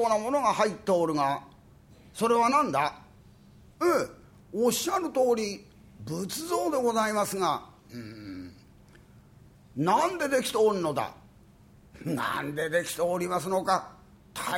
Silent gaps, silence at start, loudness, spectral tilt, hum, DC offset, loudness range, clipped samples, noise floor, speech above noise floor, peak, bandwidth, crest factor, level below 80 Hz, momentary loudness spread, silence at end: none; 0 s; -28 LUFS; -4 dB/octave; none; under 0.1%; 4 LU; under 0.1%; -55 dBFS; 28 dB; -10 dBFS; 17 kHz; 18 dB; -62 dBFS; 17 LU; 0 s